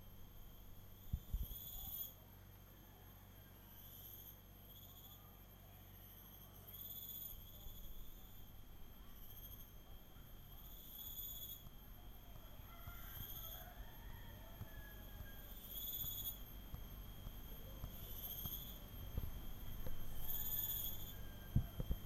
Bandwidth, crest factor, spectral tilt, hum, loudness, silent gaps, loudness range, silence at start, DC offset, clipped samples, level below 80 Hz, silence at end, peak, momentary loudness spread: 16 kHz; 26 dB; -4 dB/octave; none; -50 LUFS; none; 12 LU; 0 s; under 0.1%; under 0.1%; -54 dBFS; 0 s; -24 dBFS; 17 LU